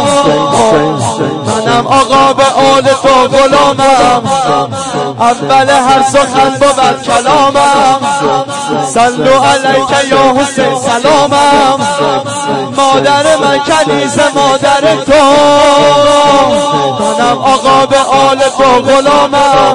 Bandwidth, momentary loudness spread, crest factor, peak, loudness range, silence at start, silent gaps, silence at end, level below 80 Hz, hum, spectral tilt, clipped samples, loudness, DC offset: 11.5 kHz; 6 LU; 8 dB; 0 dBFS; 2 LU; 0 s; none; 0 s; -38 dBFS; none; -3.5 dB/octave; 0.3%; -7 LUFS; 0.7%